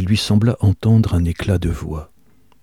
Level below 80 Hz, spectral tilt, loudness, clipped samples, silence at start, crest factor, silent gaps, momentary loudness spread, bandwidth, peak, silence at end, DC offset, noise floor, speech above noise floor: -32 dBFS; -7 dB/octave; -17 LUFS; under 0.1%; 0 s; 14 dB; none; 12 LU; 13 kHz; -4 dBFS; 0.6 s; 0.3%; -56 dBFS; 40 dB